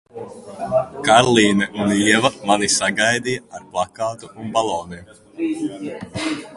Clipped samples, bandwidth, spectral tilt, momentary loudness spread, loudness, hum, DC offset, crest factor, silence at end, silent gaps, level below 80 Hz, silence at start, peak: under 0.1%; 11.5 kHz; -3.5 dB/octave; 17 LU; -19 LUFS; none; under 0.1%; 20 dB; 0 s; none; -52 dBFS; 0.15 s; 0 dBFS